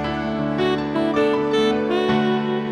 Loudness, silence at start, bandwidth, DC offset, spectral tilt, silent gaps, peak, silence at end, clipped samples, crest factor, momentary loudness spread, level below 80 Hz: -20 LUFS; 0 s; 11 kHz; under 0.1%; -6.5 dB/octave; none; -8 dBFS; 0 s; under 0.1%; 12 dB; 4 LU; -46 dBFS